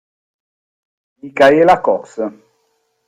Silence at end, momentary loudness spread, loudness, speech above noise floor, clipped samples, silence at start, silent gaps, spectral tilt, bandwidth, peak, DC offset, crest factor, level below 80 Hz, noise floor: 0.75 s; 16 LU; -13 LUFS; 52 dB; under 0.1%; 1.25 s; none; -5.5 dB/octave; 11 kHz; 0 dBFS; under 0.1%; 16 dB; -56 dBFS; -65 dBFS